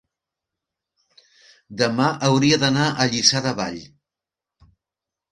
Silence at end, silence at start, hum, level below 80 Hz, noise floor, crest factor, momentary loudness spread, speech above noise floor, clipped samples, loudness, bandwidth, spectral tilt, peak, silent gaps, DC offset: 1.45 s; 1.7 s; none; -58 dBFS; -88 dBFS; 22 dB; 12 LU; 68 dB; under 0.1%; -19 LUFS; 11 kHz; -4 dB/octave; 0 dBFS; none; under 0.1%